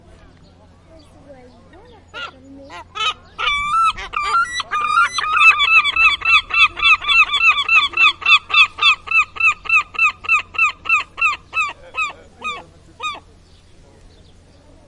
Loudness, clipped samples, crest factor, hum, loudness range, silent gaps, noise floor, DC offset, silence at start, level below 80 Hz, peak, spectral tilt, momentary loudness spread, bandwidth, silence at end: -14 LUFS; under 0.1%; 18 dB; none; 14 LU; none; -47 dBFS; under 0.1%; 1.3 s; -48 dBFS; 0 dBFS; 0 dB/octave; 17 LU; 11.5 kHz; 1.7 s